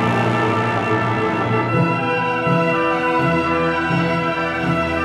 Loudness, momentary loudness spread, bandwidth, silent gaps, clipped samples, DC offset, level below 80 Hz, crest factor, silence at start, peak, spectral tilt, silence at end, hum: -18 LUFS; 2 LU; 11.5 kHz; none; under 0.1%; under 0.1%; -46 dBFS; 14 dB; 0 s; -4 dBFS; -7 dB/octave; 0 s; none